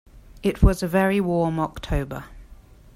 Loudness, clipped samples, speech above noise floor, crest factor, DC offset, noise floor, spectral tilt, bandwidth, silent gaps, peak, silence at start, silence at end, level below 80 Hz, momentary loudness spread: -23 LUFS; under 0.1%; 26 dB; 20 dB; under 0.1%; -47 dBFS; -7 dB/octave; 16 kHz; none; -4 dBFS; 0.35 s; 0.4 s; -30 dBFS; 8 LU